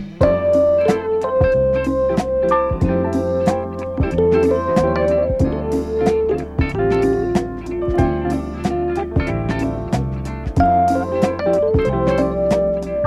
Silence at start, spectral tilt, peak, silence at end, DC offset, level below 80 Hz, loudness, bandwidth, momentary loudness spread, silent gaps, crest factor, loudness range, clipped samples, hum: 0 s; -8 dB/octave; -2 dBFS; 0 s; under 0.1%; -30 dBFS; -18 LUFS; 13 kHz; 7 LU; none; 16 dB; 3 LU; under 0.1%; none